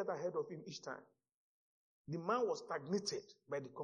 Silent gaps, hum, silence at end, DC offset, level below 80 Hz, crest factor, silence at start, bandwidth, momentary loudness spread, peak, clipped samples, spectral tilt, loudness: 1.34-2.05 s; none; 0 s; under 0.1%; -86 dBFS; 20 dB; 0 s; 9 kHz; 11 LU; -24 dBFS; under 0.1%; -4.5 dB/octave; -42 LUFS